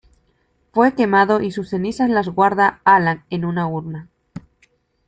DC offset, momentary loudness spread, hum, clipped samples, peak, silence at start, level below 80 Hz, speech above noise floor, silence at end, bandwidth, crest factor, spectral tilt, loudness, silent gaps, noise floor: under 0.1%; 11 LU; none; under 0.1%; -2 dBFS; 0.75 s; -54 dBFS; 46 dB; 0.7 s; 9.2 kHz; 18 dB; -7.5 dB/octave; -17 LUFS; none; -63 dBFS